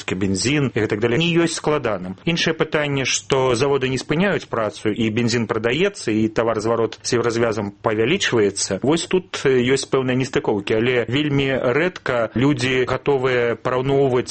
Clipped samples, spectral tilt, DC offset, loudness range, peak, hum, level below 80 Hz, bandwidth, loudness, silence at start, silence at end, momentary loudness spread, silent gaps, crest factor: under 0.1%; -5 dB/octave; under 0.1%; 1 LU; -2 dBFS; none; -48 dBFS; 8.8 kHz; -20 LUFS; 0 s; 0 s; 4 LU; none; 18 dB